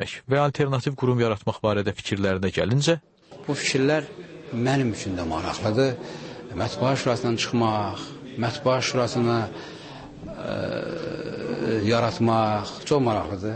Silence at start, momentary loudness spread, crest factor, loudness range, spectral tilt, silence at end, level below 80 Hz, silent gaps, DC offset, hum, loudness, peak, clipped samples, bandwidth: 0 s; 14 LU; 16 dB; 3 LU; -5.5 dB/octave; 0 s; -52 dBFS; none; under 0.1%; none; -25 LUFS; -8 dBFS; under 0.1%; 8.8 kHz